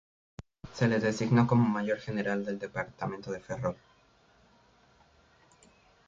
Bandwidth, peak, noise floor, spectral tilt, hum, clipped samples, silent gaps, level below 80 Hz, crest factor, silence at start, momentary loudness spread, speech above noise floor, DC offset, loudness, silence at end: 7.6 kHz; -12 dBFS; -64 dBFS; -7 dB/octave; none; under 0.1%; none; -62 dBFS; 20 dB; 0.4 s; 23 LU; 35 dB; under 0.1%; -30 LUFS; 2.35 s